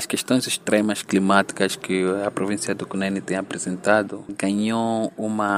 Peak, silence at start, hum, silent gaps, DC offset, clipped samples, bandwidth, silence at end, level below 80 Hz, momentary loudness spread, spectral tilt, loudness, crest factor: -2 dBFS; 0 s; none; none; under 0.1%; under 0.1%; 16 kHz; 0 s; -66 dBFS; 7 LU; -4.5 dB/octave; -23 LUFS; 20 dB